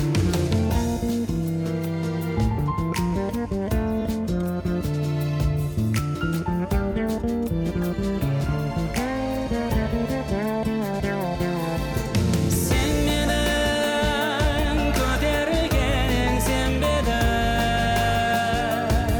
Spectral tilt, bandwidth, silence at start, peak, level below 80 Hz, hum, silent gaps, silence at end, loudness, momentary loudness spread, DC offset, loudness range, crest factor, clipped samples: -5.5 dB/octave; over 20 kHz; 0 s; -12 dBFS; -30 dBFS; none; none; 0 s; -24 LUFS; 4 LU; under 0.1%; 3 LU; 10 dB; under 0.1%